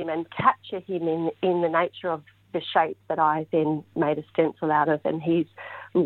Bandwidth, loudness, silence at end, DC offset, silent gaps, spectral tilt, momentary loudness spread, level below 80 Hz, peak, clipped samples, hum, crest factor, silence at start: 4.3 kHz; -25 LUFS; 0 s; under 0.1%; none; -9 dB/octave; 9 LU; -68 dBFS; -6 dBFS; under 0.1%; none; 20 dB; 0 s